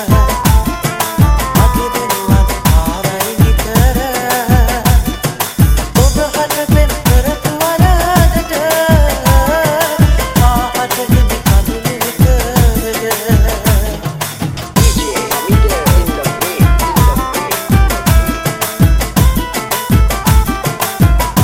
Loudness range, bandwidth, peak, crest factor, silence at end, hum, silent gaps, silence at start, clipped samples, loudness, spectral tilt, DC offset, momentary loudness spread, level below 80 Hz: 2 LU; 17 kHz; 0 dBFS; 10 dB; 0 s; none; none; 0 s; under 0.1%; -12 LUFS; -5 dB/octave; under 0.1%; 5 LU; -14 dBFS